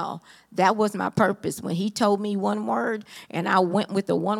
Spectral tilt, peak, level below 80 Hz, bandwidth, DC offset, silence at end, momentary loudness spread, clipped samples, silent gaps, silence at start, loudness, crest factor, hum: -5.5 dB/octave; -4 dBFS; -70 dBFS; 16 kHz; under 0.1%; 0 s; 12 LU; under 0.1%; none; 0 s; -24 LUFS; 20 dB; none